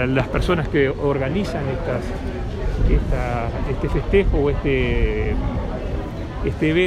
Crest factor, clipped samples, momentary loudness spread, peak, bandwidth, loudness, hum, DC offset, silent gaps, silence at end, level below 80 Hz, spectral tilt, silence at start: 16 dB; under 0.1%; 8 LU; -4 dBFS; 10 kHz; -22 LUFS; none; under 0.1%; none; 0 s; -24 dBFS; -7.5 dB/octave; 0 s